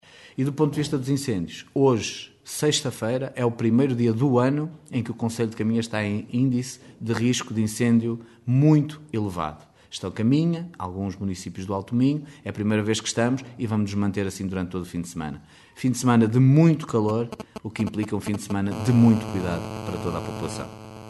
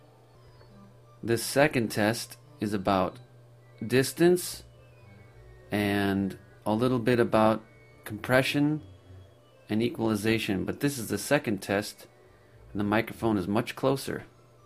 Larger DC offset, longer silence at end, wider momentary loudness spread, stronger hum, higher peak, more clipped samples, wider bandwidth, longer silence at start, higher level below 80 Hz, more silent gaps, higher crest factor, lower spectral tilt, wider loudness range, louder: neither; second, 0 s vs 0.4 s; about the same, 13 LU vs 14 LU; neither; about the same, -6 dBFS vs -8 dBFS; neither; second, 12 kHz vs 15.5 kHz; second, 0.25 s vs 0.75 s; about the same, -56 dBFS vs -58 dBFS; neither; about the same, 18 dB vs 22 dB; about the same, -6.5 dB/octave vs -5.5 dB/octave; about the same, 4 LU vs 3 LU; first, -24 LUFS vs -28 LUFS